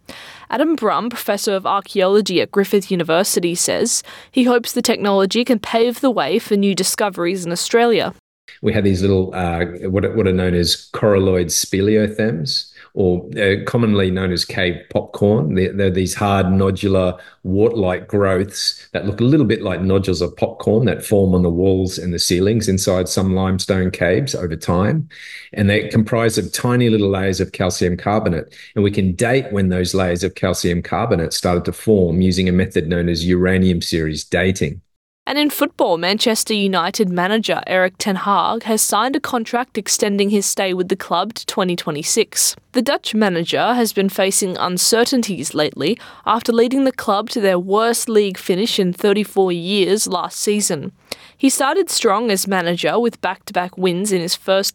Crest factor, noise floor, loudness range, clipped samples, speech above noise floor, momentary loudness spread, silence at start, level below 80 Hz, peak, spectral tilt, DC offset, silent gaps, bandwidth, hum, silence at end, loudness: 14 dB; -38 dBFS; 1 LU; under 0.1%; 21 dB; 5 LU; 0.1 s; -48 dBFS; -2 dBFS; -4.5 dB/octave; under 0.1%; 8.19-8.48 s, 34.96-35.26 s; 19 kHz; none; 0.05 s; -17 LUFS